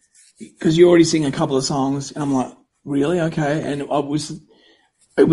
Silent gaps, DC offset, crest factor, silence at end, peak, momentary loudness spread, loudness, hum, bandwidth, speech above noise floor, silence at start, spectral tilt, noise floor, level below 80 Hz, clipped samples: none; under 0.1%; 18 dB; 0 s; -2 dBFS; 13 LU; -19 LUFS; none; 11.5 kHz; 39 dB; 0.4 s; -5.5 dB/octave; -57 dBFS; -54 dBFS; under 0.1%